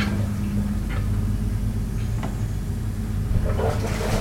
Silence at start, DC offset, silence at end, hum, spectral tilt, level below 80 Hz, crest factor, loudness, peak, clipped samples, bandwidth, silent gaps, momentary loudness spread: 0 s; under 0.1%; 0 s; none; -7 dB/octave; -28 dBFS; 16 dB; -26 LUFS; -8 dBFS; under 0.1%; 16.5 kHz; none; 4 LU